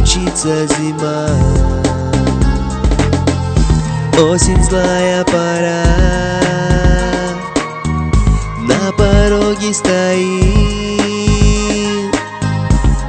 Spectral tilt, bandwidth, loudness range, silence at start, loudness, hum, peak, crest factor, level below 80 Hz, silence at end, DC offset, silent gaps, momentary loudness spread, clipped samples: -5 dB/octave; 9.2 kHz; 2 LU; 0 s; -13 LUFS; none; 0 dBFS; 12 dB; -18 dBFS; 0 s; under 0.1%; none; 6 LU; under 0.1%